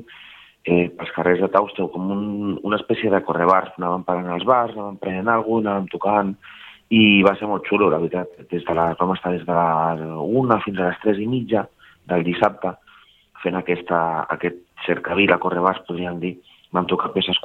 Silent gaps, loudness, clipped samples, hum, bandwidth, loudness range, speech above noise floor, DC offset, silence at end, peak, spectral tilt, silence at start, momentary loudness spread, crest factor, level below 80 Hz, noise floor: none; -21 LUFS; under 0.1%; none; 5 kHz; 4 LU; 32 dB; under 0.1%; 0.05 s; 0 dBFS; -8 dB/octave; 0 s; 11 LU; 20 dB; -58 dBFS; -52 dBFS